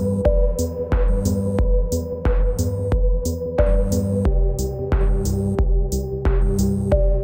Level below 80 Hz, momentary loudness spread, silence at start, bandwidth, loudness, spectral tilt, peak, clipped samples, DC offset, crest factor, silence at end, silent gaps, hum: -20 dBFS; 4 LU; 0 s; 16.5 kHz; -21 LUFS; -7.5 dB/octave; -4 dBFS; under 0.1%; under 0.1%; 14 dB; 0 s; none; none